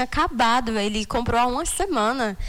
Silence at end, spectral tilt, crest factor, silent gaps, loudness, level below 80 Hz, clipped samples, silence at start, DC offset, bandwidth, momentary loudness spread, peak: 0 s; -3.5 dB/octave; 12 dB; none; -22 LUFS; -36 dBFS; under 0.1%; 0 s; under 0.1%; 19 kHz; 4 LU; -10 dBFS